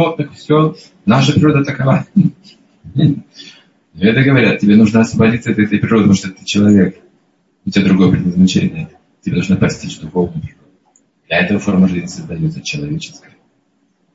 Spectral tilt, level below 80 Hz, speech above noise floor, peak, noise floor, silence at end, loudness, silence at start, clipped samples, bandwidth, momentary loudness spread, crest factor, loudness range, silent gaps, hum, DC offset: -6.5 dB/octave; -44 dBFS; 47 dB; 0 dBFS; -60 dBFS; 1.05 s; -13 LUFS; 0 s; under 0.1%; 8 kHz; 13 LU; 14 dB; 6 LU; none; none; under 0.1%